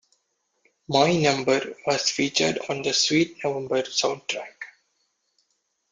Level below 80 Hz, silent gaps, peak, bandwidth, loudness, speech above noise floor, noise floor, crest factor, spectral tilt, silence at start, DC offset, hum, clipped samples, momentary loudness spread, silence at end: -64 dBFS; none; -6 dBFS; 9.6 kHz; -23 LUFS; 50 dB; -74 dBFS; 20 dB; -3.5 dB/octave; 0.9 s; under 0.1%; none; under 0.1%; 11 LU; 1.25 s